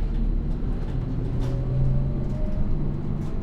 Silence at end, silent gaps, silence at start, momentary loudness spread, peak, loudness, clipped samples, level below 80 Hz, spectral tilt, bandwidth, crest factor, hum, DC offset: 0 s; none; 0 s; 5 LU; -10 dBFS; -28 LUFS; under 0.1%; -26 dBFS; -9.5 dB/octave; 5 kHz; 12 dB; none; under 0.1%